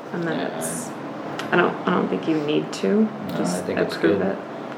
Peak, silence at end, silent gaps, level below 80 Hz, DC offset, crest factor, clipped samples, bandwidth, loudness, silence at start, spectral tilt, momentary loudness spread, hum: -2 dBFS; 0 s; none; -74 dBFS; under 0.1%; 20 dB; under 0.1%; 17 kHz; -23 LUFS; 0 s; -5.5 dB/octave; 10 LU; none